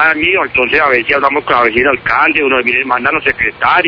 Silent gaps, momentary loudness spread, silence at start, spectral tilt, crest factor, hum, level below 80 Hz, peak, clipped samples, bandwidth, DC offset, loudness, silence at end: none; 3 LU; 0 s; -6 dB/octave; 12 dB; none; -42 dBFS; 0 dBFS; 0.2%; 5.4 kHz; under 0.1%; -11 LUFS; 0 s